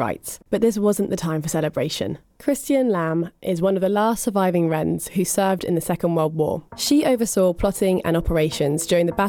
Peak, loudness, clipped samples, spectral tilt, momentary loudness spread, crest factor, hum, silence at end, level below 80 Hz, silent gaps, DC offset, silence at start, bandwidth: -6 dBFS; -21 LUFS; under 0.1%; -5.5 dB/octave; 6 LU; 14 dB; none; 0 s; -42 dBFS; none; under 0.1%; 0 s; 19 kHz